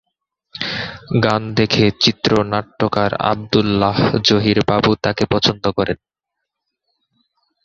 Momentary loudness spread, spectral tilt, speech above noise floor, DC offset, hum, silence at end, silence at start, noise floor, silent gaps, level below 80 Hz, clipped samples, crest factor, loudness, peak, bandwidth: 9 LU; -5.5 dB/octave; 63 dB; under 0.1%; none; 1.7 s; 0.55 s; -79 dBFS; none; -44 dBFS; under 0.1%; 18 dB; -17 LUFS; 0 dBFS; 7.6 kHz